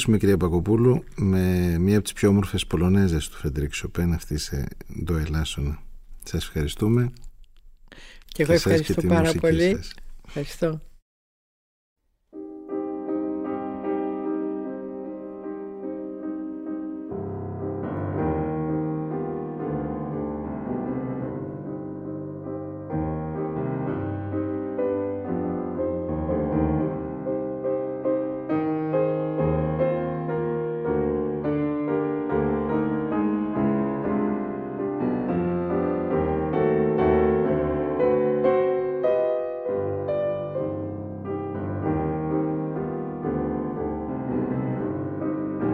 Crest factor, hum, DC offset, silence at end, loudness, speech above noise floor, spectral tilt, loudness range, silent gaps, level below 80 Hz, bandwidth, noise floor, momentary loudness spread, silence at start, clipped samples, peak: 18 dB; none; under 0.1%; 0 s; -26 LUFS; 26 dB; -7 dB/octave; 8 LU; 11.02-11.96 s; -40 dBFS; 16 kHz; -48 dBFS; 12 LU; 0 s; under 0.1%; -6 dBFS